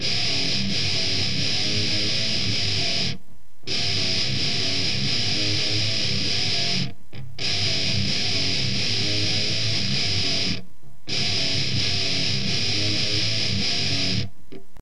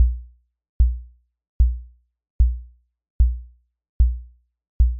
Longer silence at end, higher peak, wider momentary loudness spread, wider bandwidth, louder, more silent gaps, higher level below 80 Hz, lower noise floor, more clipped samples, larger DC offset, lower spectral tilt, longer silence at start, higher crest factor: about the same, 0 s vs 0 s; second, -10 dBFS vs -6 dBFS; second, 5 LU vs 12 LU; first, 12.5 kHz vs 0.7 kHz; first, -22 LUFS vs -25 LUFS; second, none vs 0.69-0.80 s, 1.49-1.60 s, 2.30-2.39 s, 3.10-3.19 s, 3.89-4.00 s, 4.69-4.80 s; second, -48 dBFS vs -22 dBFS; first, -52 dBFS vs -46 dBFS; neither; first, 5% vs under 0.1%; second, -3 dB/octave vs -17 dB/octave; about the same, 0 s vs 0 s; about the same, 14 dB vs 16 dB